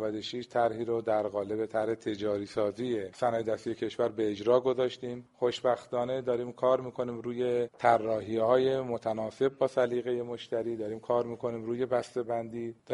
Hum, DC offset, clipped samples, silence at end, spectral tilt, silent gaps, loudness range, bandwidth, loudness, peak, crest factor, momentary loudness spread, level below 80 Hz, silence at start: none; under 0.1%; under 0.1%; 0 s; -6.5 dB/octave; none; 3 LU; 11.5 kHz; -31 LUFS; -10 dBFS; 22 dB; 8 LU; -70 dBFS; 0 s